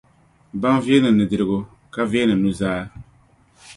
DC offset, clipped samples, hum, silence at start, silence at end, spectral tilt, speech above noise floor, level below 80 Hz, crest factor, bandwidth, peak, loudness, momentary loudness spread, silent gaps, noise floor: under 0.1%; under 0.1%; none; 0.55 s; 0.05 s; -6.5 dB/octave; 37 dB; -50 dBFS; 18 dB; 11.5 kHz; -2 dBFS; -19 LUFS; 14 LU; none; -55 dBFS